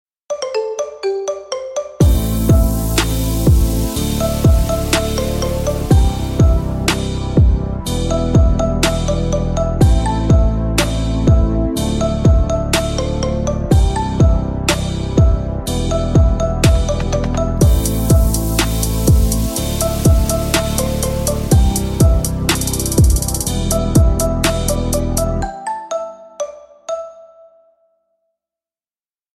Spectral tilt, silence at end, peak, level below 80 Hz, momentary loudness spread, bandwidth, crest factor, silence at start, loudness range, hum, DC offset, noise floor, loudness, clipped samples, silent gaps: -5.5 dB/octave; 2.1 s; 0 dBFS; -18 dBFS; 8 LU; 17 kHz; 14 dB; 0.3 s; 3 LU; none; under 0.1%; under -90 dBFS; -16 LUFS; under 0.1%; none